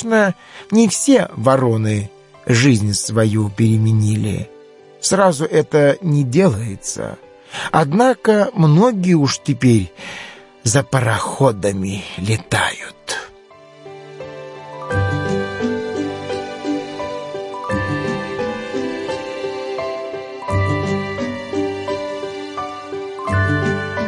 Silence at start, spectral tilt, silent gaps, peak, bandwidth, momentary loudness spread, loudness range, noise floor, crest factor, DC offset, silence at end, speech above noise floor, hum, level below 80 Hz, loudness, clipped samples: 0 s; -5.5 dB/octave; none; 0 dBFS; 11.5 kHz; 14 LU; 8 LU; -43 dBFS; 16 dB; under 0.1%; 0 s; 28 dB; none; -50 dBFS; -18 LUFS; under 0.1%